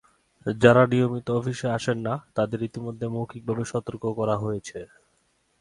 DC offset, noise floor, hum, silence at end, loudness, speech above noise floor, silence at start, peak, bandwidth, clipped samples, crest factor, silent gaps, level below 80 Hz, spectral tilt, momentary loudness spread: under 0.1%; -68 dBFS; none; 0.75 s; -25 LUFS; 44 dB; 0.45 s; -2 dBFS; 11 kHz; under 0.1%; 24 dB; none; -58 dBFS; -6.5 dB/octave; 14 LU